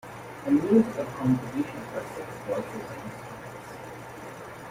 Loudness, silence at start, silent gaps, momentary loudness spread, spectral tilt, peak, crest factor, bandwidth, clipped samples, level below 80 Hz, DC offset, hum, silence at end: -28 LUFS; 0.05 s; none; 18 LU; -7 dB/octave; -8 dBFS; 20 dB; 16 kHz; under 0.1%; -60 dBFS; under 0.1%; none; 0 s